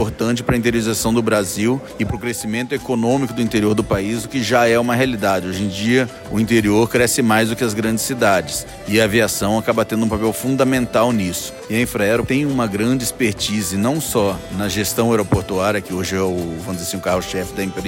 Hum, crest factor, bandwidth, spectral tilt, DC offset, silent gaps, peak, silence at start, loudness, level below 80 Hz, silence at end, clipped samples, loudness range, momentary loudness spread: none; 16 dB; 16.5 kHz; -4.5 dB/octave; under 0.1%; none; -2 dBFS; 0 s; -18 LUFS; -42 dBFS; 0 s; under 0.1%; 3 LU; 7 LU